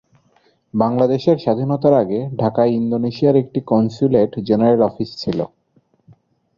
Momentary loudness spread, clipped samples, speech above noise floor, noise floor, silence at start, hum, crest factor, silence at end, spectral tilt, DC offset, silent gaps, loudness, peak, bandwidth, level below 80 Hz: 8 LU; under 0.1%; 43 dB; -60 dBFS; 0.75 s; none; 16 dB; 1.1 s; -9 dB/octave; under 0.1%; none; -17 LUFS; 0 dBFS; 7.2 kHz; -54 dBFS